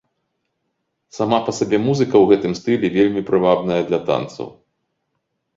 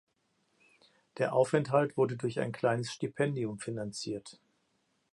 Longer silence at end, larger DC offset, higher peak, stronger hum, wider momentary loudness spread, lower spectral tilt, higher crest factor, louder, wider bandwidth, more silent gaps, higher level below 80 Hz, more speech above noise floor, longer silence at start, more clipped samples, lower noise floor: first, 1.05 s vs 0.8 s; neither; first, -2 dBFS vs -12 dBFS; neither; about the same, 9 LU vs 11 LU; about the same, -6.5 dB/octave vs -6 dB/octave; about the same, 18 dB vs 20 dB; first, -18 LUFS vs -32 LUFS; second, 7.8 kHz vs 11.5 kHz; neither; first, -56 dBFS vs -74 dBFS; first, 56 dB vs 44 dB; about the same, 1.15 s vs 1.15 s; neither; about the same, -73 dBFS vs -76 dBFS